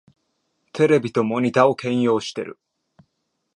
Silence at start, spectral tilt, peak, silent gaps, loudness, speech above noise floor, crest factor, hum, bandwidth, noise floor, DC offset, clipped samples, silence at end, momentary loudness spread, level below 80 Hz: 0.75 s; -6.5 dB/octave; -2 dBFS; none; -20 LUFS; 55 dB; 20 dB; none; 11 kHz; -75 dBFS; under 0.1%; under 0.1%; 1 s; 15 LU; -68 dBFS